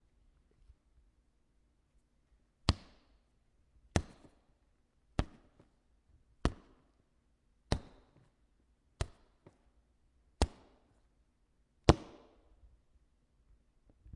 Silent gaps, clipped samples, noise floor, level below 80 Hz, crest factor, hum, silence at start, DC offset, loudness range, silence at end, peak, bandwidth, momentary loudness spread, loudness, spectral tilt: none; under 0.1%; -74 dBFS; -48 dBFS; 38 dB; none; 2.65 s; under 0.1%; 8 LU; 2.1 s; -4 dBFS; 11 kHz; 16 LU; -37 LUFS; -5.5 dB/octave